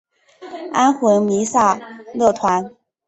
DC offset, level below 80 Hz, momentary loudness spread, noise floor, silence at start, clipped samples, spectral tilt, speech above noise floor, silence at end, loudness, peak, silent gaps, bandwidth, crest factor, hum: under 0.1%; -58 dBFS; 17 LU; -38 dBFS; 0.4 s; under 0.1%; -5 dB/octave; 22 dB; 0.4 s; -17 LUFS; -2 dBFS; none; 8.4 kHz; 16 dB; none